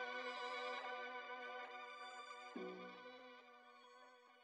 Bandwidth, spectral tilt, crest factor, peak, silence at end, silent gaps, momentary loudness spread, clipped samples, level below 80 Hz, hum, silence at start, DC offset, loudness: 10.5 kHz; -3 dB/octave; 16 dB; -36 dBFS; 0 s; none; 17 LU; under 0.1%; under -90 dBFS; none; 0 s; under 0.1%; -50 LUFS